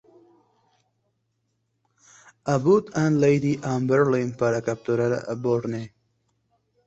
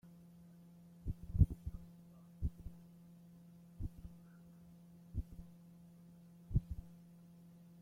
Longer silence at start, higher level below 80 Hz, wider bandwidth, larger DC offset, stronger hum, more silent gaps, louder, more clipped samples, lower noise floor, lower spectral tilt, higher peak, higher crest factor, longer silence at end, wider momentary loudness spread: first, 2.45 s vs 0.05 s; second, -62 dBFS vs -48 dBFS; second, 8.2 kHz vs 15.5 kHz; neither; neither; neither; first, -23 LUFS vs -42 LUFS; neither; first, -74 dBFS vs -60 dBFS; second, -7.5 dB/octave vs -9.5 dB/octave; first, -8 dBFS vs -16 dBFS; second, 18 dB vs 28 dB; first, 1 s vs 0.85 s; second, 9 LU vs 22 LU